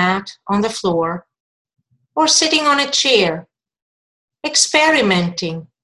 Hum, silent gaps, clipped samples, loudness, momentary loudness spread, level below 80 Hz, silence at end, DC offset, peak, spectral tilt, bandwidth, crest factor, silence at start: none; 1.40-1.65 s, 3.82-4.28 s; under 0.1%; -15 LUFS; 14 LU; -56 dBFS; 0.2 s; under 0.1%; 0 dBFS; -2.5 dB/octave; 12.5 kHz; 18 dB; 0 s